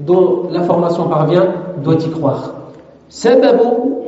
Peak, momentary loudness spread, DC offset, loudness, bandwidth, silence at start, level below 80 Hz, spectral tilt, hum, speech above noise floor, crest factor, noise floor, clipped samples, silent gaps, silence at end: 0 dBFS; 9 LU; under 0.1%; -13 LUFS; 8 kHz; 0 s; -56 dBFS; -7 dB/octave; none; 24 dB; 12 dB; -37 dBFS; under 0.1%; none; 0 s